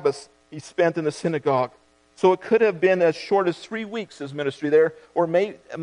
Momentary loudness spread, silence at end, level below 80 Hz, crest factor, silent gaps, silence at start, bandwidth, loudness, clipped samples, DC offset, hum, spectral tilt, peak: 13 LU; 0 s; -70 dBFS; 18 dB; none; 0 s; 10.5 kHz; -23 LUFS; under 0.1%; under 0.1%; none; -6 dB/octave; -4 dBFS